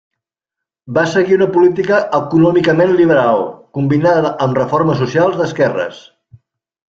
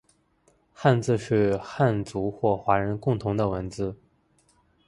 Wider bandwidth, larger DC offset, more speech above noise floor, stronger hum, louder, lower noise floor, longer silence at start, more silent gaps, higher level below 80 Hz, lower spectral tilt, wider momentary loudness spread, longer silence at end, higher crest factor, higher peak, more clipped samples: second, 7.6 kHz vs 11.5 kHz; neither; first, 70 dB vs 41 dB; neither; first, -13 LUFS vs -26 LUFS; first, -83 dBFS vs -65 dBFS; about the same, 0.85 s vs 0.8 s; neither; about the same, -52 dBFS vs -52 dBFS; about the same, -7.5 dB/octave vs -7.5 dB/octave; about the same, 7 LU vs 8 LU; about the same, 0.95 s vs 0.95 s; second, 12 dB vs 20 dB; first, 0 dBFS vs -6 dBFS; neither